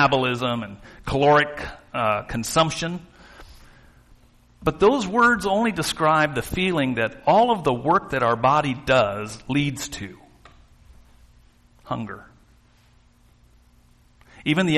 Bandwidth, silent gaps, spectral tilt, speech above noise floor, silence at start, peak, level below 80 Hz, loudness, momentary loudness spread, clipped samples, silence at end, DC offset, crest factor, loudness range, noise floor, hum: 13 kHz; none; -5 dB/octave; 35 dB; 0 s; -6 dBFS; -48 dBFS; -21 LUFS; 14 LU; under 0.1%; 0 s; under 0.1%; 18 dB; 19 LU; -56 dBFS; none